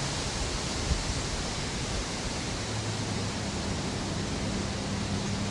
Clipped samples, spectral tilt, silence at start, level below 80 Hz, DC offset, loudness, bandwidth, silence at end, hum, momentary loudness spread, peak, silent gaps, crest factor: under 0.1%; -4 dB/octave; 0 s; -40 dBFS; under 0.1%; -32 LUFS; 11.5 kHz; 0 s; none; 2 LU; -14 dBFS; none; 16 dB